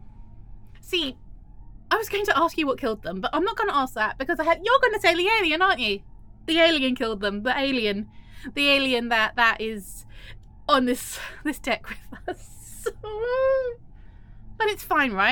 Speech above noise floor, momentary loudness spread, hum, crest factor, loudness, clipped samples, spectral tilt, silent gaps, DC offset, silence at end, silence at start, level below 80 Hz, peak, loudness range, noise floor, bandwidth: 21 dB; 17 LU; none; 20 dB; -23 LUFS; under 0.1%; -3.5 dB/octave; none; under 0.1%; 0 s; 0.05 s; -46 dBFS; -6 dBFS; 7 LU; -45 dBFS; 17.5 kHz